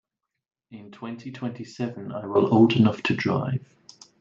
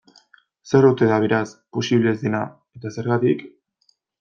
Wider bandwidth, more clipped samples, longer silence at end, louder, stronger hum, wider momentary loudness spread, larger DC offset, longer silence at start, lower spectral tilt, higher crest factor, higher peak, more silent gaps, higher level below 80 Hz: about the same, 7.6 kHz vs 7.4 kHz; neither; about the same, 0.6 s vs 0.7 s; second, -24 LUFS vs -20 LUFS; neither; first, 18 LU vs 13 LU; neither; about the same, 0.7 s vs 0.65 s; about the same, -7.5 dB/octave vs -7 dB/octave; about the same, 20 dB vs 18 dB; second, -6 dBFS vs -2 dBFS; neither; second, -68 dBFS vs -62 dBFS